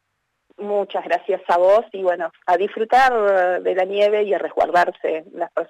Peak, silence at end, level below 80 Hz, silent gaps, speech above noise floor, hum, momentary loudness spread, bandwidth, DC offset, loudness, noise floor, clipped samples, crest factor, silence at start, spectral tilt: -8 dBFS; 0.05 s; -60 dBFS; none; 54 dB; none; 10 LU; 12 kHz; under 0.1%; -19 LUFS; -73 dBFS; under 0.1%; 12 dB; 0.6 s; -4.5 dB/octave